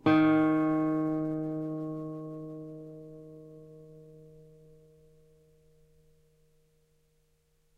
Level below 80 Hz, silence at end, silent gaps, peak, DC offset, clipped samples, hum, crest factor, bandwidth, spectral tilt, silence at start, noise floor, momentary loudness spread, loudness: -66 dBFS; 3.4 s; none; -12 dBFS; under 0.1%; under 0.1%; none; 20 dB; 4.9 kHz; -9 dB/octave; 0.05 s; -70 dBFS; 27 LU; -30 LUFS